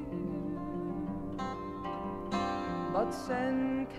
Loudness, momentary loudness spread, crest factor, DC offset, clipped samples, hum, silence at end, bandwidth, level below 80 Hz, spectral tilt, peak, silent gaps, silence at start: -35 LUFS; 6 LU; 16 dB; under 0.1%; under 0.1%; none; 0 s; 13.5 kHz; -54 dBFS; -7 dB/octave; -18 dBFS; none; 0 s